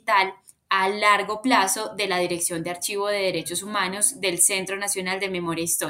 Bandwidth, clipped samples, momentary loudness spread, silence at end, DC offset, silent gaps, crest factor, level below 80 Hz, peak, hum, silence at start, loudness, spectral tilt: 16 kHz; under 0.1%; 7 LU; 0 s; under 0.1%; none; 18 dB; -66 dBFS; -6 dBFS; none; 0.05 s; -23 LUFS; -2 dB/octave